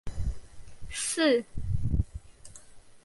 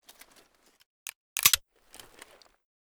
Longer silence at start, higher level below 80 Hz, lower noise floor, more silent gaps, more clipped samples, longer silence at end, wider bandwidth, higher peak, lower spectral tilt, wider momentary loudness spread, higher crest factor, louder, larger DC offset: second, 0.05 s vs 1.35 s; first, -38 dBFS vs -64 dBFS; second, -49 dBFS vs -62 dBFS; neither; neither; second, 0.05 s vs 1.3 s; second, 11.5 kHz vs over 20 kHz; second, -14 dBFS vs -4 dBFS; first, -4.5 dB/octave vs 2 dB/octave; first, 25 LU vs 22 LU; second, 16 dB vs 30 dB; second, -30 LUFS vs -24 LUFS; neither